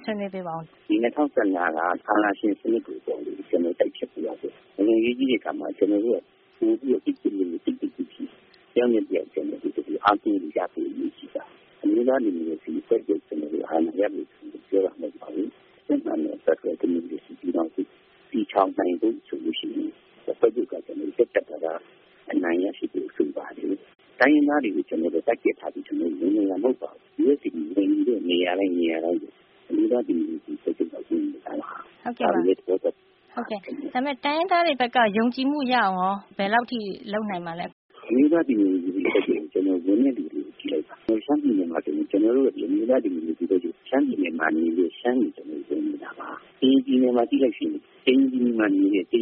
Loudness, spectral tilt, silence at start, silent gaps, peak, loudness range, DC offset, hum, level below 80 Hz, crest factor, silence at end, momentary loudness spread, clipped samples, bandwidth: -25 LUFS; -3.5 dB/octave; 0 s; 37.72-37.89 s; -6 dBFS; 4 LU; under 0.1%; none; -72 dBFS; 18 dB; 0 s; 12 LU; under 0.1%; 4.8 kHz